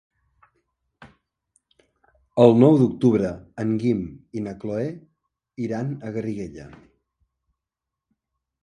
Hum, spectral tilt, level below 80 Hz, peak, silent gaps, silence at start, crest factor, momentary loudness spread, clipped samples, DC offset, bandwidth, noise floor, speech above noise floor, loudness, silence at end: none; -9 dB/octave; -56 dBFS; 0 dBFS; none; 1 s; 24 dB; 18 LU; under 0.1%; under 0.1%; 9.6 kHz; -86 dBFS; 65 dB; -22 LUFS; 1.95 s